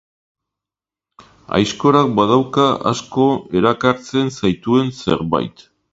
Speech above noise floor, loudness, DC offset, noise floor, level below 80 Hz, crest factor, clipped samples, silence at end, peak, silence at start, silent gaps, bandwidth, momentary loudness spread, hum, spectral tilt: 72 dB; -17 LUFS; under 0.1%; -88 dBFS; -48 dBFS; 18 dB; under 0.1%; 0.4 s; 0 dBFS; 1.5 s; none; 7.8 kHz; 6 LU; none; -6 dB/octave